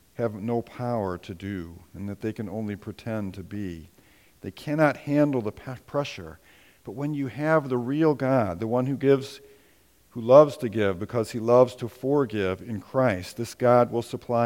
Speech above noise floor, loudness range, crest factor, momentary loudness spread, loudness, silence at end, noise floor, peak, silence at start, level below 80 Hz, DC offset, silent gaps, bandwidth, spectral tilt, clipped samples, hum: 35 dB; 10 LU; 22 dB; 17 LU; -25 LUFS; 0 s; -60 dBFS; -2 dBFS; 0.2 s; -60 dBFS; under 0.1%; none; 17 kHz; -7.5 dB/octave; under 0.1%; none